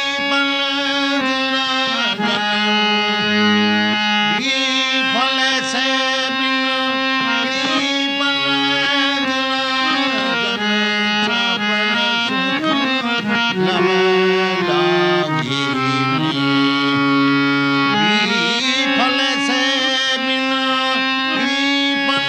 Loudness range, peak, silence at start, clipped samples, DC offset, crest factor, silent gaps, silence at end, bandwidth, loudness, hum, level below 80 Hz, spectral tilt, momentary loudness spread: 1 LU; -2 dBFS; 0 s; under 0.1%; under 0.1%; 14 dB; none; 0 s; 10.5 kHz; -16 LUFS; none; -60 dBFS; -3.5 dB/octave; 2 LU